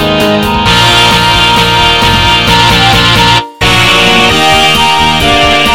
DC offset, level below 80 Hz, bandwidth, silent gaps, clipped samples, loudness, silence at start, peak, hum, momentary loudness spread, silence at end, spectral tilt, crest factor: under 0.1%; -22 dBFS; 18.5 kHz; none; 2%; -5 LUFS; 0 s; 0 dBFS; none; 4 LU; 0 s; -3.5 dB/octave; 6 dB